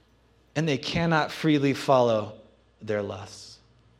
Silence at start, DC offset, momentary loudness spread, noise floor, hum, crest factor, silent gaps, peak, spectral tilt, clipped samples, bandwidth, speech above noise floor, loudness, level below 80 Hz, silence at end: 0.55 s; under 0.1%; 20 LU; -61 dBFS; none; 20 dB; none; -8 dBFS; -6 dB/octave; under 0.1%; 14 kHz; 36 dB; -25 LUFS; -58 dBFS; 0.45 s